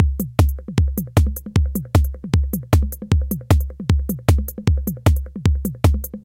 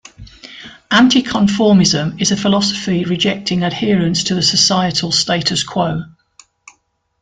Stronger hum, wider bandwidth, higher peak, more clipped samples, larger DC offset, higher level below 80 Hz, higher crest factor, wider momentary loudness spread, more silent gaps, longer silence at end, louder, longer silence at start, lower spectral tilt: neither; first, 17 kHz vs 9.4 kHz; about the same, 0 dBFS vs 0 dBFS; neither; neither; first, -22 dBFS vs -48 dBFS; about the same, 18 dB vs 16 dB; second, 2 LU vs 8 LU; neither; second, 0.05 s vs 1.15 s; second, -20 LUFS vs -14 LUFS; second, 0 s vs 0.2 s; first, -7 dB/octave vs -4 dB/octave